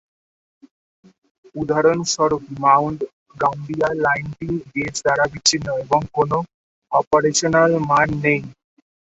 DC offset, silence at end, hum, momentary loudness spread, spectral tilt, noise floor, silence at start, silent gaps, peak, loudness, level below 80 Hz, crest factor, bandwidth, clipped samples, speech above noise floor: under 0.1%; 0.65 s; none; 10 LU; -4 dB/octave; under -90 dBFS; 1.55 s; 3.13-3.26 s, 6.54-6.82 s, 7.07-7.11 s; -2 dBFS; -19 LUFS; -50 dBFS; 18 dB; 8.4 kHz; under 0.1%; over 71 dB